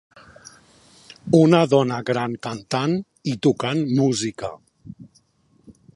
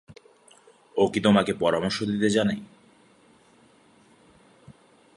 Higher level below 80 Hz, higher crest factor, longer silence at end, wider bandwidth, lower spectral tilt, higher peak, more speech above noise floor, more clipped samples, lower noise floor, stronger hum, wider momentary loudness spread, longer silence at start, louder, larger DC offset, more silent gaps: about the same, -60 dBFS vs -60 dBFS; about the same, 22 dB vs 22 dB; second, 0.25 s vs 0.45 s; about the same, 11.5 kHz vs 11.5 kHz; about the same, -6 dB/octave vs -5.5 dB/octave; first, -2 dBFS vs -6 dBFS; first, 41 dB vs 35 dB; neither; about the same, -61 dBFS vs -58 dBFS; neither; first, 15 LU vs 8 LU; first, 1.25 s vs 0.1 s; first, -20 LUFS vs -24 LUFS; neither; neither